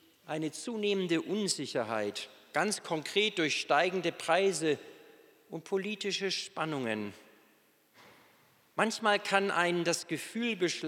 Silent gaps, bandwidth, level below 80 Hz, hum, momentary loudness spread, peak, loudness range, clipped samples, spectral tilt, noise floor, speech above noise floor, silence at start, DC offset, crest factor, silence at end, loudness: none; 17 kHz; under -90 dBFS; none; 9 LU; -10 dBFS; 6 LU; under 0.1%; -3.5 dB/octave; -67 dBFS; 35 dB; 0.25 s; under 0.1%; 24 dB; 0 s; -32 LUFS